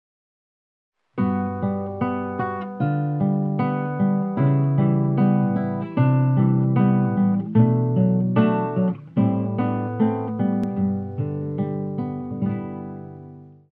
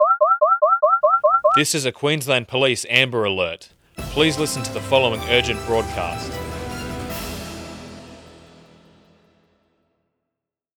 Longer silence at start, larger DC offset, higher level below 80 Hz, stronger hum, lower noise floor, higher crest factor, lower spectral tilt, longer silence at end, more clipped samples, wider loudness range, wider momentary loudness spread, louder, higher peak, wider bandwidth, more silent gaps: first, 1.15 s vs 0 s; neither; second, -62 dBFS vs -44 dBFS; neither; second, -43 dBFS vs -84 dBFS; second, 16 dB vs 22 dB; first, -12 dB/octave vs -3.5 dB/octave; second, 0.25 s vs 2.5 s; neither; second, 6 LU vs 17 LU; second, 9 LU vs 18 LU; second, -22 LUFS vs -19 LUFS; second, -6 dBFS vs 0 dBFS; second, 3.9 kHz vs over 20 kHz; neither